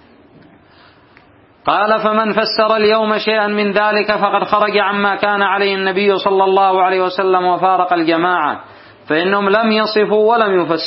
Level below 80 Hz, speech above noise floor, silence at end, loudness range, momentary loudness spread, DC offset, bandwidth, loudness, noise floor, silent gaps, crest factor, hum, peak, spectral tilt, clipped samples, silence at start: -58 dBFS; 33 dB; 0 s; 2 LU; 3 LU; under 0.1%; 5.8 kHz; -14 LUFS; -47 dBFS; none; 14 dB; none; 0 dBFS; -9 dB/octave; under 0.1%; 1.65 s